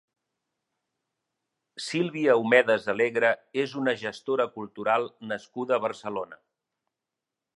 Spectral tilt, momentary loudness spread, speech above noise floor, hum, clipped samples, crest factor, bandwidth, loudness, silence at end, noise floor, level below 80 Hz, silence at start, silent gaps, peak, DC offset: -5 dB/octave; 14 LU; 61 dB; none; under 0.1%; 22 dB; 11.5 kHz; -26 LUFS; 1.25 s; -87 dBFS; -78 dBFS; 1.75 s; none; -6 dBFS; under 0.1%